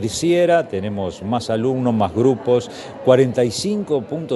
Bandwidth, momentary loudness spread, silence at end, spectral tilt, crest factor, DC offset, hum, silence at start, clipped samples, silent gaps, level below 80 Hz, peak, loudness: 11.5 kHz; 9 LU; 0 s; -6 dB/octave; 18 dB; under 0.1%; none; 0 s; under 0.1%; none; -52 dBFS; 0 dBFS; -19 LUFS